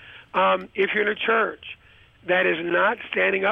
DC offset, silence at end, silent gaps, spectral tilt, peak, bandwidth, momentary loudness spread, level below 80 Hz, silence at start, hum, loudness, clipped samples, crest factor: under 0.1%; 0 s; none; -6.5 dB/octave; -8 dBFS; 5.6 kHz; 9 LU; -62 dBFS; 0 s; none; -22 LUFS; under 0.1%; 14 dB